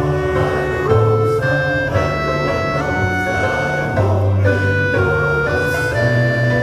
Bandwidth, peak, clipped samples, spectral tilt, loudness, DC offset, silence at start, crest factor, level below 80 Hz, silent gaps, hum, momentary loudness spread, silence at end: 15 kHz; -2 dBFS; under 0.1%; -7 dB/octave; -16 LUFS; under 0.1%; 0 s; 14 dB; -34 dBFS; none; none; 3 LU; 0 s